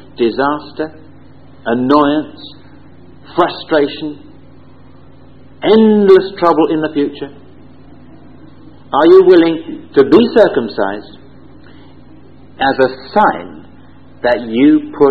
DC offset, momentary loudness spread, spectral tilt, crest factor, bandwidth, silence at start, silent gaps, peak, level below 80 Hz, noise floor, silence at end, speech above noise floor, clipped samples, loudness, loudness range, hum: 1%; 17 LU; -8 dB/octave; 14 dB; 5.4 kHz; 0.2 s; none; 0 dBFS; -48 dBFS; -41 dBFS; 0 s; 30 dB; 0.4%; -12 LUFS; 7 LU; none